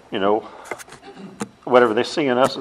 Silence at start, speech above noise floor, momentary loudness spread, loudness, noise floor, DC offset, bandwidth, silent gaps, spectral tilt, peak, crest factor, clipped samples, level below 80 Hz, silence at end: 0.1 s; 22 dB; 22 LU; -19 LUFS; -40 dBFS; under 0.1%; 13 kHz; none; -4.5 dB/octave; 0 dBFS; 20 dB; under 0.1%; -64 dBFS; 0 s